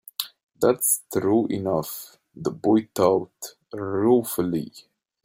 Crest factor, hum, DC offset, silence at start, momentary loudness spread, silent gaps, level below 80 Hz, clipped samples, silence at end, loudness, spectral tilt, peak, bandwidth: 18 dB; none; under 0.1%; 0.2 s; 16 LU; 0.43-0.49 s; -62 dBFS; under 0.1%; 0.45 s; -23 LUFS; -5 dB/octave; -6 dBFS; 16.5 kHz